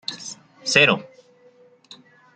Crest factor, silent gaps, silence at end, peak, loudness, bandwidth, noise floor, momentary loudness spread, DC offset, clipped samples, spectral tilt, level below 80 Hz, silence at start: 24 dB; none; 1.35 s; -2 dBFS; -18 LUFS; 13.5 kHz; -54 dBFS; 20 LU; under 0.1%; under 0.1%; -2.5 dB/octave; -68 dBFS; 0.1 s